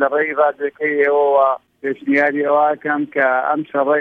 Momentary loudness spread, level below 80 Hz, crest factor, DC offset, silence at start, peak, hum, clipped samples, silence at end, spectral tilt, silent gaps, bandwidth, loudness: 6 LU; -70 dBFS; 14 dB; under 0.1%; 0 s; -2 dBFS; none; under 0.1%; 0 s; -7.5 dB/octave; none; 4.8 kHz; -17 LUFS